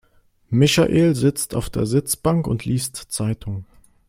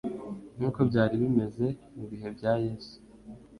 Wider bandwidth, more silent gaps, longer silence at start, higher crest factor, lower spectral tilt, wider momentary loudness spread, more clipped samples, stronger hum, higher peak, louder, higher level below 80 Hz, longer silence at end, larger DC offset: first, 16.5 kHz vs 11 kHz; neither; first, 0.5 s vs 0.05 s; about the same, 18 dB vs 18 dB; second, -5.5 dB/octave vs -9 dB/octave; second, 10 LU vs 21 LU; neither; neither; first, -2 dBFS vs -12 dBFS; first, -20 LUFS vs -29 LUFS; first, -44 dBFS vs -56 dBFS; first, 0.45 s vs 0 s; neither